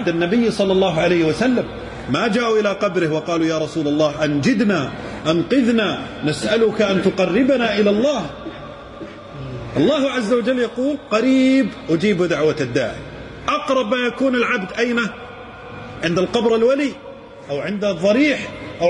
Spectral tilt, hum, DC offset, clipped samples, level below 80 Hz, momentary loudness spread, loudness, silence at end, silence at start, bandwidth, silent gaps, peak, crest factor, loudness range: -5.5 dB/octave; none; under 0.1%; under 0.1%; -48 dBFS; 16 LU; -18 LUFS; 0 s; 0 s; 11 kHz; none; -4 dBFS; 14 dB; 3 LU